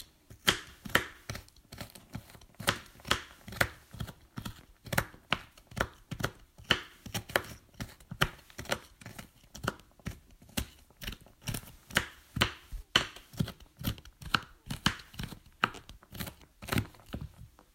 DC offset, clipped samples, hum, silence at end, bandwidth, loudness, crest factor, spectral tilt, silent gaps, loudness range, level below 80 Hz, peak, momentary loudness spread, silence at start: under 0.1%; under 0.1%; none; 0.3 s; 16.5 kHz; -35 LUFS; 32 dB; -3 dB/octave; none; 5 LU; -50 dBFS; -6 dBFS; 17 LU; 0 s